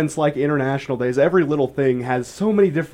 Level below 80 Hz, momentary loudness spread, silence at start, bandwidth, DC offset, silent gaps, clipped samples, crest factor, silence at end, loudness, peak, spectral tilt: -56 dBFS; 5 LU; 0 s; 13 kHz; under 0.1%; none; under 0.1%; 14 dB; 0.05 s; -19 LUFS; -6 dBFS; -7 dB/octave